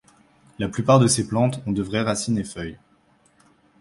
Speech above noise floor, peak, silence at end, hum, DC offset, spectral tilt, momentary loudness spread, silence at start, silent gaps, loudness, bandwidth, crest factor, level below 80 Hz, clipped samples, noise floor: 39 dB; -4 dBFS; 1.05 s; none; under 0.1%; -5.5 dB/octave; 15 LU; 0.6 s; none; -22 LUFS; 11.5 kHz; 20 dB; -50 dBFS; under 0.1%; -60 dBFS